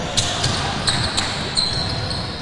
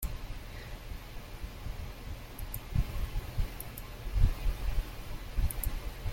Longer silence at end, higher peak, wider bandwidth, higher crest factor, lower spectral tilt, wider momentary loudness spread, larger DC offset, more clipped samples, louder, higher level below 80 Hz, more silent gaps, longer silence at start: about the same, 0 s vs 0 s; first, -4 dBFS vs -12 dBFS; second, 11.5 kHz vs 16.5 kHz; about the same, 18 dB vs 22 dB; second, -3 dB/octave vs -5 dB/octave; second, 4 LU vs 12 LU; neither; neither; first, -20 LUFS vs -39 LUFS; about the same, -36 dBFS vs -36 dBFS; neither; about the same, 0 s vs 0 s